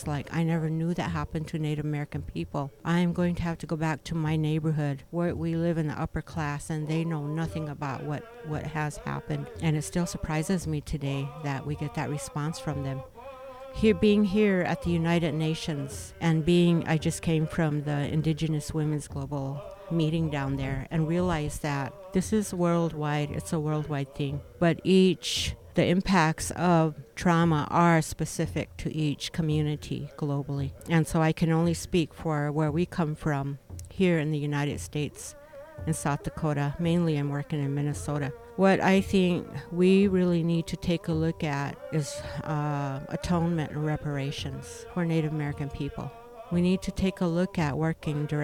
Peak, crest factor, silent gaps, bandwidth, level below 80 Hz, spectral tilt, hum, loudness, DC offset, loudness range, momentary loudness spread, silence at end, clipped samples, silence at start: -10 dBFS; 18 dB; none; 15 kHz; -48 dBFS; -6.5 dB/octave; none; -28 LUFS; under 0.1%; 6 LU; 11 LU; 0 s; under 0.1%; 0 s